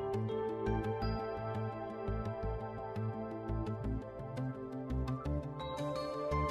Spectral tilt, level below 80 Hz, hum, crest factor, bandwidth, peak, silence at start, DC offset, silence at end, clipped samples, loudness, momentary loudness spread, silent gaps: -8 dB/octave; -46 dBFS; none; 16 dB; 11.5 kHz; -22 dBFS; 0 s; under 0.1%; 0 s; under 0.1%; -39 LUFS; 6 LU; none